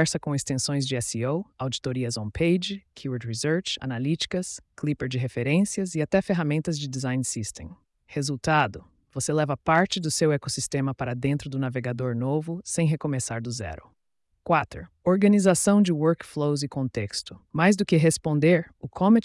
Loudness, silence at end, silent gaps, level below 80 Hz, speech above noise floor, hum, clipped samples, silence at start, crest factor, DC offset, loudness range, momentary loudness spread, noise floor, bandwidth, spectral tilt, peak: -25 LUFS; 0.05 s; none; -56 dBFS; 48 dB; none; under 0.1%; 0 s; 16 dB; under 0.1%; 5 LU; 12 LU; -73 dBFS; 12 kHz; -5 dB/octave; -8 dBFS